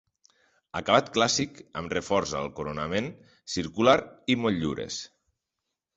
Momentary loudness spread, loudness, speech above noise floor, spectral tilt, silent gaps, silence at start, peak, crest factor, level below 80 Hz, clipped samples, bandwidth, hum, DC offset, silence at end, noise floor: 15 LU; -27 LUFS; 58 dB; -4 dB/octave; none; 0.75 s; -6 dBFS; 24 dB; -56 dBFS; under 0.1%; 8.2 kHz; none; under 0.1%; 0.9 s; -85 dBFS